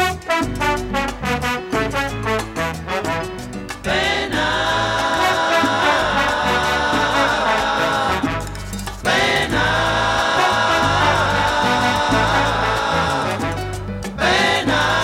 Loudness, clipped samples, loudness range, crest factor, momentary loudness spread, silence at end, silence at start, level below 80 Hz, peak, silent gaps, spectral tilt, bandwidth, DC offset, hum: -18 LUFS; under 0.1%; 5 LU; 14 dB; 8 LU; 0 s; 0 s; -34 dBFS; -4 dBFS; none; -4 dB/octave; 17.5 kHz; under 0.1%; none